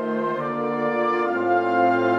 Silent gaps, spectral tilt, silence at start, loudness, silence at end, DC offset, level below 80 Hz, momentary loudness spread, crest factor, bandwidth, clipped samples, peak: none; -7.5 dB/octave; 0 s; -22 LUFS; 0 s; under 0.1%; -70 dBFS; 6 LU; 14 dB; 7.2 kHz; under 0.1%; -8 dBFS